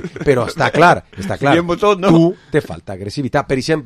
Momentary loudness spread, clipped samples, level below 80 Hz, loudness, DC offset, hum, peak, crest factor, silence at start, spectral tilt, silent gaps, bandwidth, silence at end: 13 LU; under 0.1%; -42 dBFS; -15 LUFS; under 0.1%; none; 0 dBFS; 14 dB; 0 s; -6.5 dB/octave; none; 13.5 kHz; 0 s